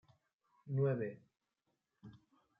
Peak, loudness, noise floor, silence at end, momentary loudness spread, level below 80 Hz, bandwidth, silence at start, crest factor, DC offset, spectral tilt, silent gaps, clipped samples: -24 dBFS; -39 LUFS; -86 dBFS; 0.45 s; 24 LU; -84 dBFS; 3.8 kHz; 0.65 s; 18 dB; under 0.1%; -10 dB/octave; none; under 0.1%